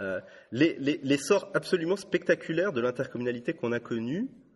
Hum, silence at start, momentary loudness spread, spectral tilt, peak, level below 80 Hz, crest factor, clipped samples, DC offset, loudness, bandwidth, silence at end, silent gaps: none; 0 s; 7 LU; -5.5 dB/octave; -10 dBFS; -70 dBFS; 18 dB; under 0.1%; under 0.1%; -29 LUFS; 11.5 kHz; 0.25 s; none